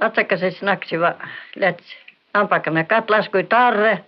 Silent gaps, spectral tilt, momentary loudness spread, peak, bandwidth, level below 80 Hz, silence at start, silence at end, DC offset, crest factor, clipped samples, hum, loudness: none; -8.5 dB/octave; 7 LU; -4 dBFS; 5.8 kHz; -72 dBFS; 0 s; 0.05 s; under 0.1%; 16 dB; under 0.1%; none; -18 LUFS